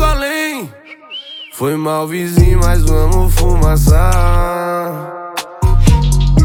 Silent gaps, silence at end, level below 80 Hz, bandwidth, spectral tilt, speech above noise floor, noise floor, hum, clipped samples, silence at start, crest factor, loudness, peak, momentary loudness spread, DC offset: none; 0 s; -14 dBFS; 17 kHz; -6 dB/octave; 24 dB; -33 dBFS; none; under 0.1%; 0 s; 12 dB; -14 LUFS; 0 dBFS; 14 LU; under 0.1%